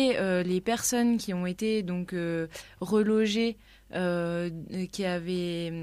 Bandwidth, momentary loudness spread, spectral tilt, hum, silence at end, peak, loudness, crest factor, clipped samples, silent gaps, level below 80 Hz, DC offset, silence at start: 15.5 kHz; 10 LU; -5 dB/octave; none; 0 s; -14 dBFS; -29 LUFS; 14 dB; under 0.1%; none; -58 dBFS; under 0.1%; 0 s